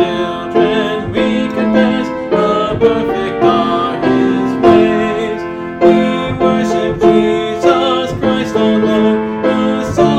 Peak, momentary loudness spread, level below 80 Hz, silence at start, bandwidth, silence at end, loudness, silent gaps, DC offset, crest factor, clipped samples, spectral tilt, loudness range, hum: 0 dBFS; 6 LU; -40 dBFS; 0 s; 9 kHz; 0 s; -13 LUFS; none; under 0.1%; 12 dB; under 0.1%; -6.5 dB/octave; 1 LU; none